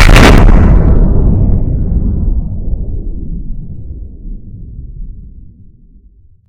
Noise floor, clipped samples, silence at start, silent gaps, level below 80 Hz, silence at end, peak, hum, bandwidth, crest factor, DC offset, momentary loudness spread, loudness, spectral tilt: -42 dBFS; 4%; 0 s; none; -10 dBFS; 1.1 s; 0 dBFS; none; 13.5 kHz; 10 dB; under 0.1%; 24 LU; -11 LUFS; -6 dB/octave